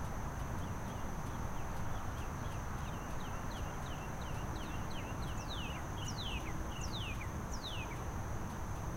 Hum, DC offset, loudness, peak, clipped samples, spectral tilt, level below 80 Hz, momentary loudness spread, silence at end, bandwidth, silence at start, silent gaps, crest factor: none; under 0.1%; -42 LUFS; -28 dBFS; under 0.1%; -5 dB/octave; -46 dBFS; 2 LU; 0 s; 16 kHz; 0 s; none; 12 dB